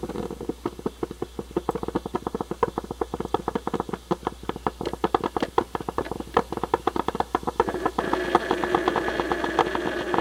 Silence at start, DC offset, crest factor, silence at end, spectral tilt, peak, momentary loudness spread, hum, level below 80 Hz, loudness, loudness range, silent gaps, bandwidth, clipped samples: 0 s; under 0.1%; 24 dB; 0 s; -5.5 dB/octave; -4 dBFS; 9 LU; none; -46 dBFS; -27 LUFS; 5 LU; none; 16.5 kHz; under 0.1%